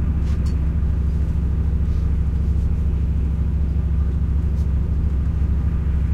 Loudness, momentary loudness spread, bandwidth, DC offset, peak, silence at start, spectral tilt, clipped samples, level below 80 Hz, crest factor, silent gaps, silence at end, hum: -22 LUFS; 1 LU; 3.3 kHz; under 0.1%; -10 dBFS; 0 s; -9.5 dB/octave; under 0.1%; -20 dBFS; 10 dB; none; 0 s; none